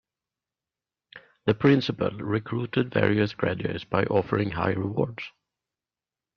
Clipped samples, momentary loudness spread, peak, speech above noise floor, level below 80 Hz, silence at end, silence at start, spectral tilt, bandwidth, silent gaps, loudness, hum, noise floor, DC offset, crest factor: under 0.1%; 9 LU; -6 dBFS; over 65 dB; -58 dBFS; 1.05 s; 1.15 s; -8.5 dB/octave; 6.6 kHz; none; -26 LUFS; none; under -90 dBFS; under 0.1%; 22 dB